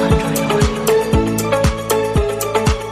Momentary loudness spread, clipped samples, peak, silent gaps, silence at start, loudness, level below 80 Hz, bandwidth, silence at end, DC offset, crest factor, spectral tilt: 3 LU; under 0.1%; -2 dBFS; none; 0 s; -16 LUFS; -24 dBFS; 15.5 kHz; 0 s; under 0.1%; 14 dB; -5.5 dB/octave